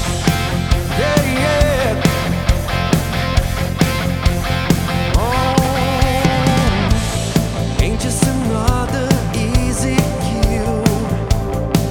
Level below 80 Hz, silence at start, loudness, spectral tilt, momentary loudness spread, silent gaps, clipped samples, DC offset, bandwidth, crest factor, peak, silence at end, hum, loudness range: -22 dBFS; 0 s; -17 LUFS; -5.5 dB/octave; 4 LU; none; under 0.1%; under 0.1%; 19 kHz; 16 dB; 0 dBFS; 0 s; none; 1 LU